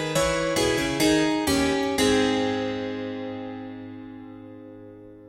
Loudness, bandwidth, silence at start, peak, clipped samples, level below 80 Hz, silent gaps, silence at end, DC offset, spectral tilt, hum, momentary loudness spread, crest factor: -24 LUFS; 16 kHz; 0 s; -8 dBFS; under 0.1%; -46 dBFS; none; 0 s; under 0.1%; -4 dB/octave; none; 22 LU; 16 dB